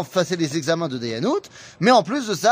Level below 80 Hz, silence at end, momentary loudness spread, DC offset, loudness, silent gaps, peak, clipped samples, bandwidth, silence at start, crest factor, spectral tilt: -66 dBFS; 0 s; 9 LU; under 0.1%; -21 LUFS; none; -4 dBFS; under 0.1%; 15.5 kHz; 0 s; 18 dB; -4.5 dB/octave